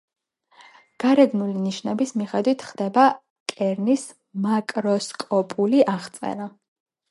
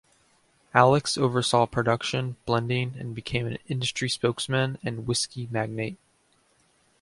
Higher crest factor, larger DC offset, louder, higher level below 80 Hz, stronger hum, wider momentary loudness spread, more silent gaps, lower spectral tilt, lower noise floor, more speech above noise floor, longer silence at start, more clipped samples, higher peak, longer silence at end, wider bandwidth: about the same, 20 dB vs 24 dB; neither; first, -22 LUFS vs -26 LUFS; second, -74 dBFS vs -56 dBFS; neither; about the same, 12 LU vs 10 LU; first, 3.30-3.46 s vs none; about the same, -5.5 dB/octave vs -4.5 dB/octave; second, -54 dBFS vs -66 dBFS; second, 33 dB vs 40 dB; first, 1 s vs 0.75 s; neither; about the same, -4 dBFS vs -2 dBFS; second, 0.6 s vs 1.05 s; about the same, 11.5 kHz vs 11.5 kHz